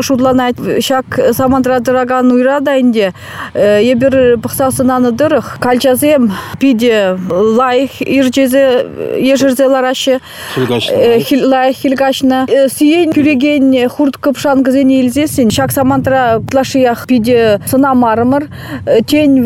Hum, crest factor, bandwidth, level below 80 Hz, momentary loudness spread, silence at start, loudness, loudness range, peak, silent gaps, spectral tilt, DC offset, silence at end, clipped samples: none; 8 dB; 16.5 kHz; -44 dBFS; 5 LU; 0 s; -10 LUFS; 1 LU; 0 dBFS; none; -5 dB/octave; under 0.1%; 0 s; under 0.1%